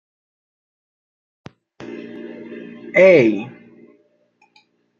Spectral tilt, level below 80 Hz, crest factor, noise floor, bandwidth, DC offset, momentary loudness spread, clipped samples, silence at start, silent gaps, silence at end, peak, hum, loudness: -7 dB/octave; -72 dBFS; 20 dB; -60 dBFS; 7.2 kHz; under 0.1%; 25 LU; under 0.1%; 1.8 s; none; 1.5 s; -2 dBFS; none; -14 LUFS